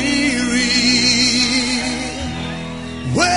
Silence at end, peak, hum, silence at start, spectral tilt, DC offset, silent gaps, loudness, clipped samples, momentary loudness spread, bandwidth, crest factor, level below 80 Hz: 0 s; -2 dBFS; none; 0 s; -2.5 dB/octave; 0.7%; none; -16 LUFS; under 0.1%; 14 LU; 11 kHz; 14 dB; -38 dBFS